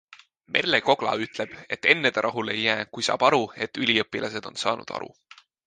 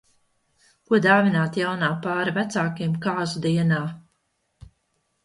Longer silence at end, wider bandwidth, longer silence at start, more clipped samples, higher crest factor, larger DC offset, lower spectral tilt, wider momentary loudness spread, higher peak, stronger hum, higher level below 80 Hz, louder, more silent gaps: second, 0.6 s vs 1.25 s; second, 9.8 kHz vs 11.5 kHz; second, 0.5 s vs 0.9 s; neither; about the same, 24 dB vs 20 dB; neither; second, -3.5 dB/octave vs -6.5 dB/octave; first, 11 LU vs 8 LU; about the same, -2 dBFS vs -4 dBFS; neither; about the same, -66 dBFS vs -62 dBFS; about the same, -24 LUFS vs -23 LUFS; neither